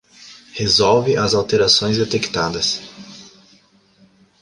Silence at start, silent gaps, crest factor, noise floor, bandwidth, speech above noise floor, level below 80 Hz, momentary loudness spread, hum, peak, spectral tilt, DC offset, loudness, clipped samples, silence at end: 0.2 s; none; 18 dB; -54 dBFS; 11.5 kHz; 37 dB; -48 dBFS; 20 LU; none; -2 dBFS; -3.5 dB/octave; under 0.1%; -16 LUFS; under 0.1%; 1.15 s